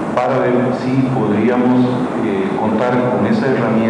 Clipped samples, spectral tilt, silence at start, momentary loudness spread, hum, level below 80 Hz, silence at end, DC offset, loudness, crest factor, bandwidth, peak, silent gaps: under 0.1%; -8 dB/octave; 0 s; 4 LU; none; -52 dBFS; 0 s; under 0.1%; -15 LUFS; 12 dB; 10 kHz; -2 dBFS; none